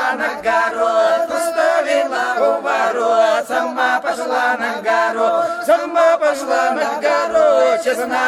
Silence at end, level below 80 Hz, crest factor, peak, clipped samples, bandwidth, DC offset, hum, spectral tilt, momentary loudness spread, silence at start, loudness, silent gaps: 0 s; -60 dBFS; 12 dB; -4 dBFS; under 0.1%; 15 kHz; under 0.1%; none; -2 dB/octave; 5 LU; 0 s; -16 LUFS; none